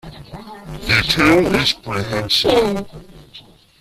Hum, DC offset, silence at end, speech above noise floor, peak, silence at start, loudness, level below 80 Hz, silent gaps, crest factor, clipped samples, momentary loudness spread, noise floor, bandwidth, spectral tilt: none; under 0.1%; 0.4 s; 26 dB; -2 dBFS; 0.05 s; -16 LUFS; -38 dBFS; none; 16 dB; under 0.1%; 23 LU; -44 dBFS; 15.5 kHz; -4.5 dB/octave